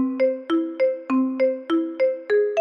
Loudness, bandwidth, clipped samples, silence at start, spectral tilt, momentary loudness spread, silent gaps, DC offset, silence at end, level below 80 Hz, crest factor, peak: -22 LUFS; 6.6 kHz; under 0.1%; 0 s; -5.5 dB/octave; 3 LU; none; under 0.1%; 0 s; -74 dBFS; 10 dB; -12 dBFS